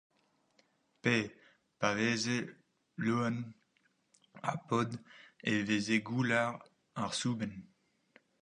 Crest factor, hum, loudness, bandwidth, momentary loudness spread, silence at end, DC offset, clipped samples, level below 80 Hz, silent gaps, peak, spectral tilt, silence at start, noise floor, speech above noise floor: 24 dB; none; -34 LUFS; 10.5 kHz; 16 LU; 0.75 s; under 0.1%; under 0.1%; -74 dBFS; none; -14 dBFS; -5 dB/octave; 1.05 s; -75 dBFS; 41 dB